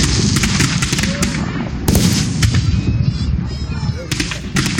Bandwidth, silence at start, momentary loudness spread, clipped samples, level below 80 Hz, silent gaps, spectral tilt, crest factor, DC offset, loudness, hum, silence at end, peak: 17 kHz; 0 s; 7 LU; under 0.1%; -26 dBFS; none; -4.5 dB/octave; 16 dB; under 0.1%; -17 LUFS; none; 0 s; 0 dBFS